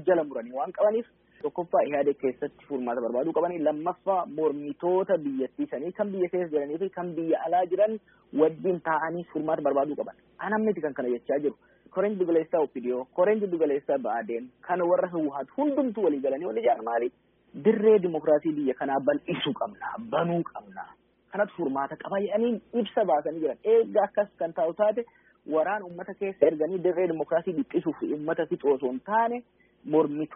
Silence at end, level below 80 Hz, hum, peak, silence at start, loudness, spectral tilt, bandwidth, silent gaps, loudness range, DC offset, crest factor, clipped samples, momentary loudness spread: 0 s; -72 dBFS; none; -6 dBFS; 0 s; -27 LUFS; -2.5 dB/octave; 3.8 kHz; none; 3 LU; under 0.1%; 20 dB; under 0.1%; 9 LU